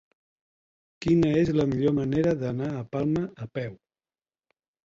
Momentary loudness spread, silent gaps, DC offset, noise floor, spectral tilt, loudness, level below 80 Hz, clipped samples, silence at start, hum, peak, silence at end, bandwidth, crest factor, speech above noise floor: 12 LU; none; under 0.1%; under -90 dBFS; -8.5 dB/octave; -26 LUFS; -54 dBFS; under 0.1%; 1 s; none; -12 dBFS; 1.1 s; 7.6 kHz; 16 dB; over 65 dB